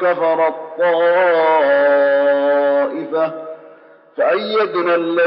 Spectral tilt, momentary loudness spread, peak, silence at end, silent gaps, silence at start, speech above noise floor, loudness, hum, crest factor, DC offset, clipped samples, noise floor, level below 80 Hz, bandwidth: -2 dB/octave; 7 LU; -6 dBFS; 0 s; none; 0 s; 29 dB; -15 LUFS; none; 10 dB; under 0.1%; under 0.1%; -44 dBFS; -88 dBFS; 5.6 kHz